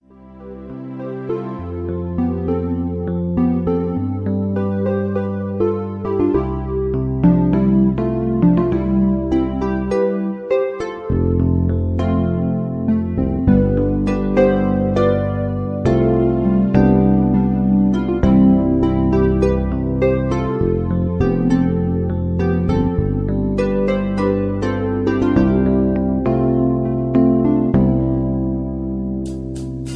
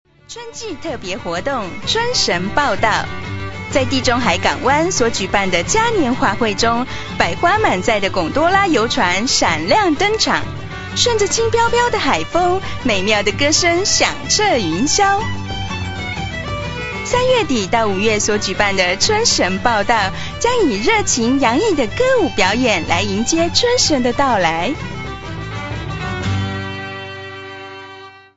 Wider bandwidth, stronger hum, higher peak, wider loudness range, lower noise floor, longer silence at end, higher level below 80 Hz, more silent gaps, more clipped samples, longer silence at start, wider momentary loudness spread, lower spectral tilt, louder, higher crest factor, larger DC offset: second, 6.8 kHz vs 8 kHz; neither; about the same, 0 dBFS vs 0 dBFS; about the same, 5 LU vs 4 LU; about the same, -38 dBFS vs -38 dBFS; second, 0 s vs 0.15 s; first, -30 dBFS vs -36 dBFS; neither; neither; about the same, 0.2 s vs 0.3 s; second, 8 LU vs 12 LU; first, -10 dB/octave vs -3 dB/octave; about the same, -18 LUFS vs -16 LUFS; about the same, 16 dB vs 16 dB; neither